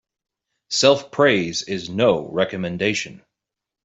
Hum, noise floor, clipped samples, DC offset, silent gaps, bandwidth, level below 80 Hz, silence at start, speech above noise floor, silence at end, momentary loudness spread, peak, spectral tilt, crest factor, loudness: none; -85 dBFS; under 0.1%; under 0.1%; none; 8.2 kHz; -60 dBFS; 0.7 s; 66 dB; 0.7 s; 9 LU; -2 dBFS; -4 dB/octave; 18 dB; -20 LUFS